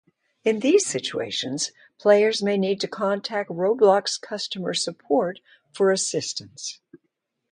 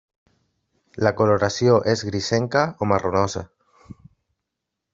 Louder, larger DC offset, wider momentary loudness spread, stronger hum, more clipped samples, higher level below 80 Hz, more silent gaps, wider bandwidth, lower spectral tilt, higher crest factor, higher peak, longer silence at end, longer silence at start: about the same, -23 LUFS vs -21 LUFS; neither; first, 12 LU vs 6 LU; neither; neither; second, -72 dBFS vs -58 dBFS; neither; first, 11 kHz vs 7.8 kHz; second, -3.5 dB/octave vs -5.5 dB/octave; about the same, 20 dB vs 20 dB; about the same, -4 dBFS vs -4 dBFS; second, 0.55 s vs 1.5 s; second, 0.45 s vs 0.95 s